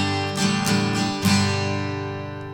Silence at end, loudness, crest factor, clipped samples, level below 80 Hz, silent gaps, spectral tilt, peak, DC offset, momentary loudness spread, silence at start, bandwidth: 0 s; -22 LUFS; 16 dB; under 0.1%; -52 dBFS; none; -4.5 dB/octave; -6 dBFS; under 0.1%; 9 LU; 0 s; 18 kHz